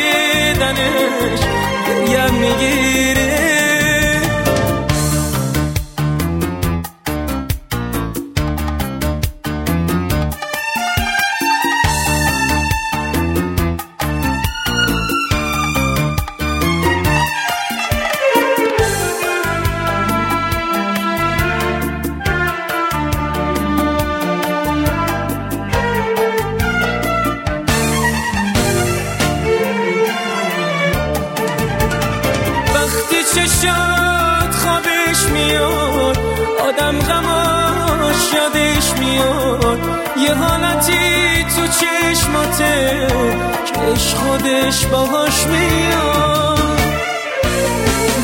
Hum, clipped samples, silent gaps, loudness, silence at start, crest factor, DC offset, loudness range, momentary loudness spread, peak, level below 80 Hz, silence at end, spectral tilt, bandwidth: none; under 0.1%; none; -15 LUFS; 0 s; 16 dB; under 0.1%; 4 LU; 6 LU; 0 dBFS; -28 dBFS; 0 s; -4 dB/octave; 16.5 kHz